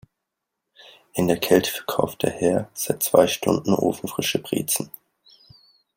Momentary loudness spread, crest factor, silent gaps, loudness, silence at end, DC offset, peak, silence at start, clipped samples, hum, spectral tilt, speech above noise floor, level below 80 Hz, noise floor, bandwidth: 7 LU; 22 dB; none; -22 LUFS; 1.1 s; under 0.1%; -2 dBFS; 1.15 s; under 0.1%; none; -4 dB/octave; 60 dB; -58 dBFS; -82 dBFS; 16.5 kHz